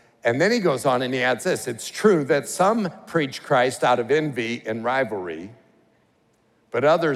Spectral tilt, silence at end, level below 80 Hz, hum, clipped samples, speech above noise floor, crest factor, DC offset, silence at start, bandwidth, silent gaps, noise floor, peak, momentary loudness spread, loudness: -5 dB/octave; 0 s; -72 dBFS; none; under 0.1%; 41 dB; 18 dB; under 0.1%; 0.25 s; 15.5 kHz; none; -63 dBFS; -4 dBFS; 8 LU; -22 LUFS